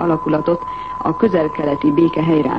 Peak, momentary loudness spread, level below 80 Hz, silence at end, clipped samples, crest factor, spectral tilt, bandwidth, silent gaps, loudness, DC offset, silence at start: -2 dBFS; 7 LU; -46 dBFS; 0 s; under 0.1%; 14 dB; -9.5 dB/octave; 5.6 kHz; none; -17 LUFS; 0.4%; 0 s